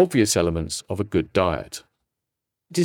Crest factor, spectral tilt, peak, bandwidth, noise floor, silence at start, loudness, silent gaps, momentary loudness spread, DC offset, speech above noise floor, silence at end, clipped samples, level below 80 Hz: 18 dB; -4.5 dB/octave; -6 dBFS; 18 kHz; -84 dBFS; 0 s; -23 LUFS; none; 13 LU; under 0.1%; 62 dB; 0 s; under 0.1%; -48 dBFS